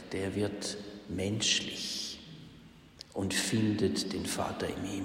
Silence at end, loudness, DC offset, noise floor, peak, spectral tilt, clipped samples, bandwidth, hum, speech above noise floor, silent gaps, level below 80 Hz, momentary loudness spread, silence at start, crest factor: 0 s; -33 LUFS; under 0.1%; -54 dBFS; -16 dBFS; -3.5 dB/octave; under 0.1%; 16 kHz; none; 22 dB; none; -60 dBFS; 16 LU; 0 s; 18 dB